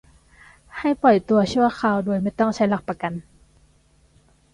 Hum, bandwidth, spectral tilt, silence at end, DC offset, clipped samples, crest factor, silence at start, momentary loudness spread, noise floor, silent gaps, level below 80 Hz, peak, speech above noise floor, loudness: none; 11 kHz; -6.5 dB/octave; 1.3 s; under 0.1%; under 0.1%; 18 dB; 0.75 s; 12 LU; -58 dBFS; none; -54 dBFS; -6 dBFS; 38 dB; -21 LUFS